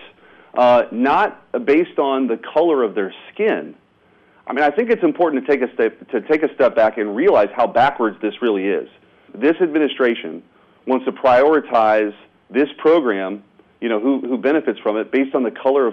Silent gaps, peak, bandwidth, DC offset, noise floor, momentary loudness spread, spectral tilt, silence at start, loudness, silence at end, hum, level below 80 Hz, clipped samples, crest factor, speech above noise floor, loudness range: none; -6 dBFS; 6.6 kHz; under 0.1%; -55 dBFS; 10 LU; -7 dB/octave; 0 s; -18 LUFS; 0 s; none; -60 dBFS; under 0.1%; 12 dB; 38 dB; 3 LU